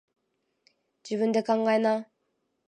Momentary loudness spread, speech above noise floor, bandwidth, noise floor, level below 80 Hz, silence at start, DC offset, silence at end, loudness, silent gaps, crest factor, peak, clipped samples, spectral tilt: 8 LU; 52 dB; 9.6 kHz; -77 dBFS; -82 dBFS; 1.05 s; under 0.1%; 0.65 s; -26 LUFS; none; 18 dB; -12 dBFS; under 0.1%; -6 dB/octave